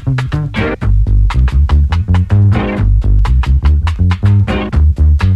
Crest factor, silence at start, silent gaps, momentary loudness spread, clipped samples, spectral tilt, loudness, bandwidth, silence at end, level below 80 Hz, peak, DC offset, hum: 10 dB; 0 s; none; 5 LU; under 0.1%; -8 dB/octave; -12 LUFS; 7 kHz; 0 s; -12 dBFS; 0 dBFS; under 0.1%; none